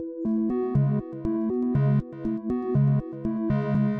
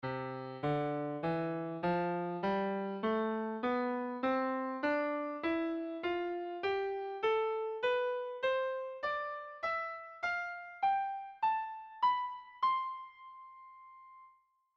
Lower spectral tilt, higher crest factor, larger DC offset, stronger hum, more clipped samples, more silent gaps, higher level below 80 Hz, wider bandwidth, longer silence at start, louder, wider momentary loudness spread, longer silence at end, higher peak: first, -12 dB/octave vs -7.5 dB/octave; about the same, 12 dB vs 14 dB; neither; neither; neither; neither; first, -48 dBFS vs -72 dBFS; second, 3.8 kHz vs 7.2 kHz; about the same, 0 s vs 0.05 s; first, -26 LUFS vs -36 LUFS; second, 6 LU vs 9 LU; second, 0 s vs 0.5 s; first, -12 dBFS vs -22 dBFS